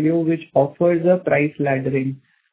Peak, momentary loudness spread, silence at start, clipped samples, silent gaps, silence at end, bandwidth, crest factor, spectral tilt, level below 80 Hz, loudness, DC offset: -4 dBFS; 7 LU; 0 s; under 0.1%; none; 0.35 s; 4 kHz; 16 dB; -12 dB/octave; -60 dBFS; -19 LUFS; under 0.1%